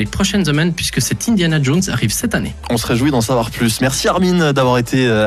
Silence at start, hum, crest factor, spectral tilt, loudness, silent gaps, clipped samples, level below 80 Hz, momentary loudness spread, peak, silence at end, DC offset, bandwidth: 0 s; none; 12 dB; -4.5 dB/octave; -15 LUFS; none; under 0.1%; -34 dBFS; 4 LU; -4 dBFS; 0 s; under 0.1%; 14 kHz